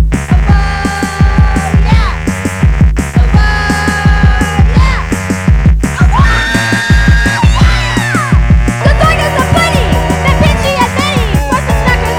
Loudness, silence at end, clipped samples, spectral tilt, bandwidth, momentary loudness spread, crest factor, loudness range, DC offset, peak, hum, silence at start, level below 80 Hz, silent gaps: -10 LUFS; 0 s; 0.9%; -5.5 dB/octave; 16 kHz; 3 LU; 8 dB; 1 LU; under 0.1%; 0 dBFS; none; 0 s; -12 dBFS; none